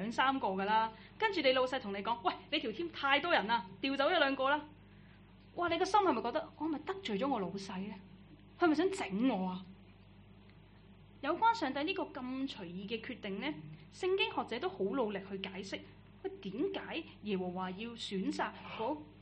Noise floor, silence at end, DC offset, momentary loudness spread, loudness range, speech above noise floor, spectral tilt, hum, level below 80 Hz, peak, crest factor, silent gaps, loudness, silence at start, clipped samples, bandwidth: -59 dBFS; 0 s; under 0.1%; 12 LU; 6 LU; 23 dB; -5 dB/octave; 50 Hz at -60 dBFS; -66 dBFS; -14 dBFS; 22 dB; none; -35 LUFS; 0 s; under 0.1%; 8.4 kHz